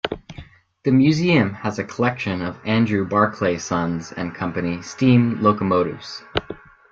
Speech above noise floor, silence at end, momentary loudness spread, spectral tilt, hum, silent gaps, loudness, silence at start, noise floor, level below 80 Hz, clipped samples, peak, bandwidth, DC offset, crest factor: 23 dB; 0.35 s; 12 LU; -6.5 dB/octave; none; none; -20 LUFS; 0.05 s; -42 dBFS; -52 dBFS; under 0.1%; -2 dBFS; 7.6 kHz; under 0.1%; 18 dB